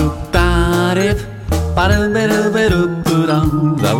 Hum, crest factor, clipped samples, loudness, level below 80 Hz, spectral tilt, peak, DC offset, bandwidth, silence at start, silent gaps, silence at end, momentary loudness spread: none; 14 dB; under 0.1%; -15 LUFS; -24 dBFS; -6 dB/octave; 0 dBFS; under 0.1%; 17 kHz; 0 s; none; 0 s; 4 LU